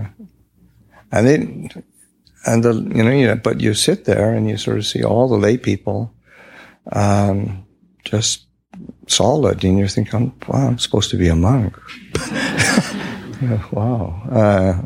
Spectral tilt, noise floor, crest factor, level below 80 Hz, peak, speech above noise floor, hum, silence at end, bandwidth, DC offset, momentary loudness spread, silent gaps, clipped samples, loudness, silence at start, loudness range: -5 dB/octave; -53 dBFS; 16 dB; -40 dBFS; -2 dBFS; 37 dB; none; 0 s; 15.5 kHz; under 0.1%; 12 LU; none; under 0.1%; -17 LUFS; 0 s; 3 LU